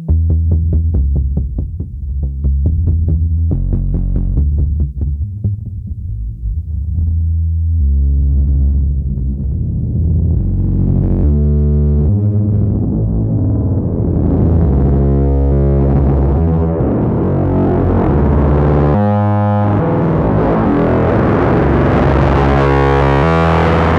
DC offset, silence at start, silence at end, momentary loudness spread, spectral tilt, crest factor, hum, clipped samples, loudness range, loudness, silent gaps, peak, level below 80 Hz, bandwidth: under 0.1%; 0 s; 0 s; 8 LU; -10 dB/octave; 12 dB; none; under 0.1%; 5 LU; -14 LUFS; none; 0 dBFS; -18 dBFS; 5.2 kHz